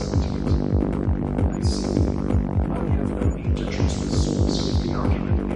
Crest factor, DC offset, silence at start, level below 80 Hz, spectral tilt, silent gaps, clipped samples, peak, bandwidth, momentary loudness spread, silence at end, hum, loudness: 16 dB; under 0.1%; 0 s; -28 dBFS; -7 dB/octave; none; under 0.1%; -6 dBFS; 10.5 kHz; 2 LU; 0 s; none; -23 LUFS